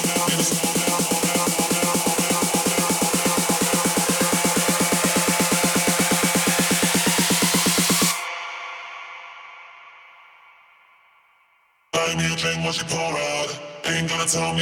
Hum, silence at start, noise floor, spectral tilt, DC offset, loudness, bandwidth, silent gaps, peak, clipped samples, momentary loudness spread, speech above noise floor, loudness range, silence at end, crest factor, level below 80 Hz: none; 0 s; -62 dBFS; -2.5 dB/octave; under 0.1%; -20 LUFS; 19 kHz; none; -6 dBFS; under 0.1%; 11 LU; 38 dB; 11 LU; 0 s; 16 dB; -54 dBFS